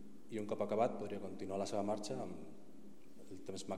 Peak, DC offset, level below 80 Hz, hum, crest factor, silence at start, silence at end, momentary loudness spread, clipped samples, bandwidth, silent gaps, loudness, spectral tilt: -24 dBFS; 0.4%; -78 dBFS; none; 18 dB; 0 s; 0 s; 22 LU; under 0.1%; 15.5 kHz; none; -41 LUFS; -5.5 dB/octave